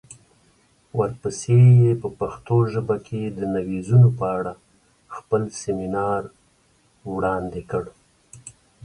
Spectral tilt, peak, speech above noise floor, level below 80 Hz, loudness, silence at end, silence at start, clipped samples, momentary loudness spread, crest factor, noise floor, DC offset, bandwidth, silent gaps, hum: -8 dB/octave; -6 dBFS; 41 dB; -52 dBFS; -21 LUFS; 0.35 s; 0.1 s; under 0.1%; 24 LU; 16 dB; -61 dBFS; under 0.1%; 10 kHz; none; none